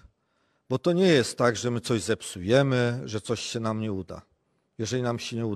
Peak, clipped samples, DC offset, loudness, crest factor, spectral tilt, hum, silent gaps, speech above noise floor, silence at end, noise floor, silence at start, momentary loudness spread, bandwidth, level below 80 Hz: -8 dBFS; under 0.1%; under 0.1%; -26 LUFS; 20 dB; -5.5 dB/octave; none; none; 46 dB; 0 s; -71 dBFS; 0.7 s; 11 LU; 13.5 kHz; -60 dBFS